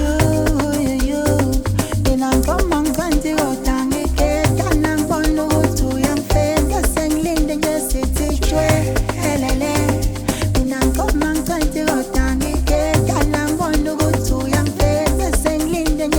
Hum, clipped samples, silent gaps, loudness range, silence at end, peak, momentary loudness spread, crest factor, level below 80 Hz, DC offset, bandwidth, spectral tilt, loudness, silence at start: none; under 0.1%; none; 1 LU; 0 s; 0 dBFS; 3 LU; 16 dB; -22 dBFS; under 0.1%; 19 kHz; -5.5 dB/octave; -18 LUFS; 0 s